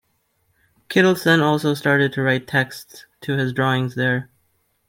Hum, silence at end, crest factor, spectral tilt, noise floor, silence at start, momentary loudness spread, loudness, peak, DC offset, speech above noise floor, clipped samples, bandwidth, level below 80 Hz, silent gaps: none; 0.65 s; 18 dB; -6 dB/octave; -67 dBFS; 0.9 s; 10 LU; -19 LUFS; -2 dBFS; under 0.1%; 48 dB; under 0.1%; 16.5 kHz; -62 dBFS; none